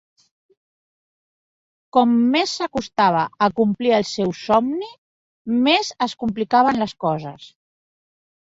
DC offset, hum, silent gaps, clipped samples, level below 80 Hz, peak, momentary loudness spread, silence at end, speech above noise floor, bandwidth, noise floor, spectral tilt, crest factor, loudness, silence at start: under 0.1%; none; 4.98-5.45 s; under 0.1%; -58 dBFS; -4 dBFS; 9 LU; 1 s; over 71 dB; 7.8 kHz; under -90 dBFS; -5 dB/octave; 18 dB; -19 LUFS; 1.95 s